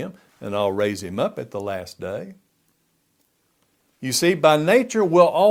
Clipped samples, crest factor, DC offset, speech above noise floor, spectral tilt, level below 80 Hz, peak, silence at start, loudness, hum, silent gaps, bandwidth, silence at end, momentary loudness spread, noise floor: under 0.1%; 20 dB; under 0.1%; 48 dB; -4.5 dB/octave; -64 dBFS; -2 dBFS; 0 s; -20 LUFS; none; none; 17 kHz; 0 s; 17 LU; -67 dBFS